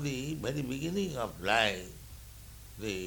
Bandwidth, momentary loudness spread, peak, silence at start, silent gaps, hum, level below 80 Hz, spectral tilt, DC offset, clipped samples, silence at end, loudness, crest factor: 19.5 kHz; 22 LU; -12 dBFS; 0 s; none; none; -52 dBFS; -4.5 dB/octave; under 0.1%; under 0.1%; 0 s; -33 LUFS; 22 dB